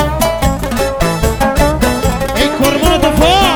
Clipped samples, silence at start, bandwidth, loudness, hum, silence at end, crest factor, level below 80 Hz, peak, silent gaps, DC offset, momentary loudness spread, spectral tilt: under 0.1%; 0 s; over 20 kHz; -12 LUFS; none; 0 s; 12 dB; -20 dBFS; 0 dBFS; none; under 0.1%; 5 LU; -4.5 dB/octave